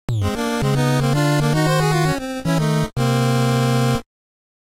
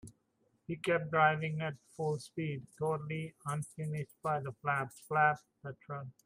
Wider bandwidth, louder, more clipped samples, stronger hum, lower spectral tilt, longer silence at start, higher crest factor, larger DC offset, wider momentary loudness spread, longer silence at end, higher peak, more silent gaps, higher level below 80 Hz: about the same, 16 kHz vs 15.5 kHz; first, -19 LUFS vs -35 LUFS; neither; neither; about the same, -6 dB/octave vs -6 dB/octave; about the same, 0.1 s vs 0.05 s; second, 12 dB vs 20 dB; neither; second, 4 LU vs 15 LU; first, 0.75 s vs 0.15 s; first, -8 dBFS vs -16 dBFS; neither; first, -38 dBFS vs -74 dBFS